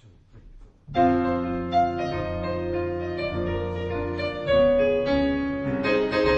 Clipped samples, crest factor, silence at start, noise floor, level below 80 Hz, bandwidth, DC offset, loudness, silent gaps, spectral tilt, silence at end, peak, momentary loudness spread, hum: under 0.1%; 16 dB; 0.05 s; -49 dBFS; -42 dBFS; 7.4 kHz; under 0.1%; -25 LUFS; none; -7.5 dB/octave; 0 s; -8 dBFS; 8 LU; none